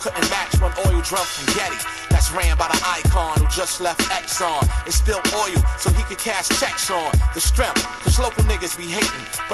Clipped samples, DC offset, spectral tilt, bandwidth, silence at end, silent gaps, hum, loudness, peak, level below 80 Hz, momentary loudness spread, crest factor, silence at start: under 0.1%; under 0.1%; -3.5 dB/octave; 13 kHz; 0 s; none; none; -20 LUFS; -2 dBFS; -22 dBFS; 3 LU; 18 dB; 0 s